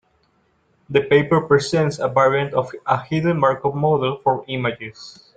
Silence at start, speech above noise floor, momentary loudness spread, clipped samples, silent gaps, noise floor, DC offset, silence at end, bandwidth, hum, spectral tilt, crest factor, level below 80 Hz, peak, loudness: 0.9 s; 44 dB; 8 LU; under 0.1%; none; -63 dBFS; under 0.1%; 0.25 s; 9.2 kHz; none; -6.5 dB/octave; 20 dB; -56 dBFS; 0 dBFS; -19 LUFS